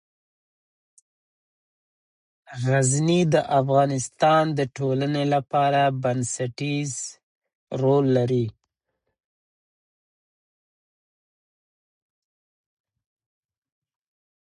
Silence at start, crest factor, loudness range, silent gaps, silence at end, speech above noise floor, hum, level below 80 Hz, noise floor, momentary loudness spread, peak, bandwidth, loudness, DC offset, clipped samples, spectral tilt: 2.5 s; 20 dB; 6 LU; 7.23-7.42 s, 7.55-7.67 s; 5.95 s; 58 dB; none; -64 dBFS; -79 dBFS; 10 LU; -6 dBFS; 11 kHz; -22 LUFS; under 0.1%; under 0.1%; -5.5 dB/octave